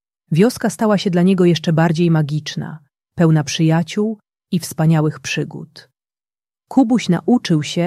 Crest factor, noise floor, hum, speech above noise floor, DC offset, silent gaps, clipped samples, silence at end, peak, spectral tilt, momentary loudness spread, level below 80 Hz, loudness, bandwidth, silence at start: 14 dB; under -90 dBFS; none; over 74 dB; under 0.1%; none; under 0.1%; 0 s; -2 dBFS; -6.5 dB/octave; 11 LU; -58 dBFS; -17 LUFS; 14 kHz; 0.3 s